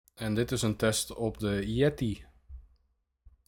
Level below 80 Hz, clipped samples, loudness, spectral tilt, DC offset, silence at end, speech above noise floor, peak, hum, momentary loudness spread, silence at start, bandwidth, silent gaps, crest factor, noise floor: -50 dBFS; under 0.1%; -30 LUFS; -5 dB/octave; under 0.1%; 0.85 s; 45 dB; -14 dBFS; none; 7 LU; 0.2 s; 18 kHz; none; 18 dB; -75 dBFS